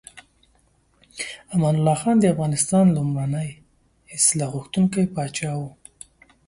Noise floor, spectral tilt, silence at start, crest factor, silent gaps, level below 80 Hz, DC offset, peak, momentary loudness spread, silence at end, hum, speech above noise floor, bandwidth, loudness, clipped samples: -62 dBFS; -5.5 dB/octave; 0.15 s; 18 dB; none; -56 dBFS; under 0.1%; -4 dBFS; 15 LU; 0.75 s; none; 41 dB; 11.5 kHz; -21 LUFS; under 0.1%